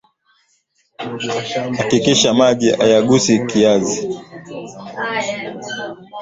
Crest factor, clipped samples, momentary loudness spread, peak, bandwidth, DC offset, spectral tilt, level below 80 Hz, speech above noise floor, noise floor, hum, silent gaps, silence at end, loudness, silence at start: 18 dB; under 0.1%; 18 LU; 0 dBFS; 8 kHz; under 0.1%; -4 dB/octave; -54 dBFS; 46 dB; -62 dBFS; none; none; 0 s; -16 LUFS; 1 s